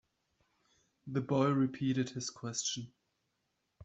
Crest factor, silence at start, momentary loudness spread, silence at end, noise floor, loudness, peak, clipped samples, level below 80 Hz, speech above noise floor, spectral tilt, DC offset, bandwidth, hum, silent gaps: 18 dB; 1.05 s; 12 LU; 0 s; -82 dBFS; -35 LUFS; -18 dBFS; under 0.1%; -74 dBFS; 48 dB; -5 dB/octave; under 0.1%; 8.2 kHz; none; none